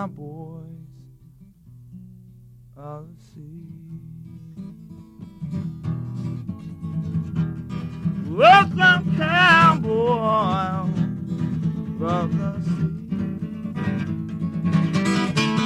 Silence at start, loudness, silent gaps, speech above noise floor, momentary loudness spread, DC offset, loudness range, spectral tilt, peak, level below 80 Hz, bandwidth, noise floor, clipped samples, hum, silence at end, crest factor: 0 s; -21 LUFS; none; 28 dB; 25 LU; under 0.1%; 24 LU; -6 dB/octave; -2 dBFS; -50 dBFS; 11 kHz; -49 dBFS; under 0.1%; none; 0 s; 20 dB